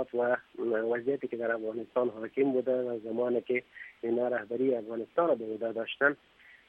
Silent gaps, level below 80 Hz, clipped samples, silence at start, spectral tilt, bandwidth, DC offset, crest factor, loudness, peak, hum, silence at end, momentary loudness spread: none; -78 dBFS; under 0.1%; 0 s; -8 dB/octave; 4.4 kHz; under 0.1%; 18 dB; -31 LUFS; -12 dBFS; none; 0.1 s; 6 LU